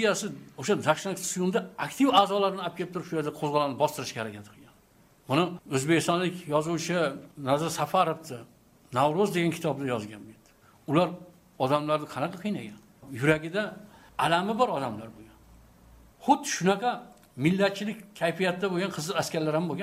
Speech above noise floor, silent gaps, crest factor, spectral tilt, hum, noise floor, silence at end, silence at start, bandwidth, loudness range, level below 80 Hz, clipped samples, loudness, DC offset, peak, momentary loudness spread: 33 dB; none; 20 dB; -5 dB/octave; none; -60 dBFS; 0 s; 0 s; 16 kHz; 3 LU; -64 dBFS; under 0.1%; -28 LUFS; under 0.1%; -8 dBFS; 12 LU